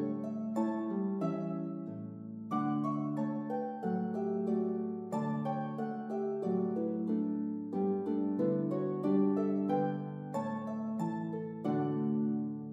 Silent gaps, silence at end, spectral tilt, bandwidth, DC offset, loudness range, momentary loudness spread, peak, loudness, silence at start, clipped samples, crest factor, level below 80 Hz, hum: none; 0 s; -9.5 dB/octave; 7.6 kHz; under 0.1%; 3 LU; 6 LU; -18 dBFS; -35 LUFS; 0 s; under 0.1%; 16 dB; -86 dBFS; none